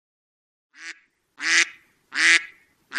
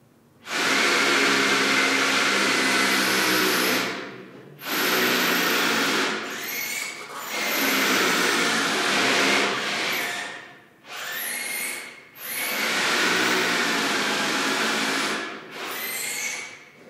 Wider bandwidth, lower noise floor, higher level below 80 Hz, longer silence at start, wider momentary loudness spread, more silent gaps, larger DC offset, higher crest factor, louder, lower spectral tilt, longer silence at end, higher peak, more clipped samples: second, 12.5 kHz vs 16 kHz; first, -51 dBFS vs -47 dBFS; about the same, -80 dBFS vs -78 dBFS; first, 0.8 s vs 0.45 s; first, 23 LU vs 13 LU; neither; neither; first, 26 dB vs 16 dB; first, -19 LUFS vs -22 LUFS; second, 3 dB/octave vs -1.5 dB/octave; about the same, 0 s vs 0 s; first, 0 dBFS vs -8 dBFS; neither